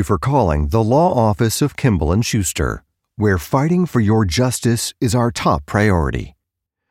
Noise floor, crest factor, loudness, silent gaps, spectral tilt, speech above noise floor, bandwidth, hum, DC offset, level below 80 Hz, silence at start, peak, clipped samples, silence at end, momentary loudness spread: -79 dBFS; 14 dB; -17 LUFS; none; -5.5 dB/octave; 63 dB; 16.5 kHz; none; under 0.1%; -32 dBFS; 0 s; -4 dBFS; under 0.1%; 0.6 s; 5 LU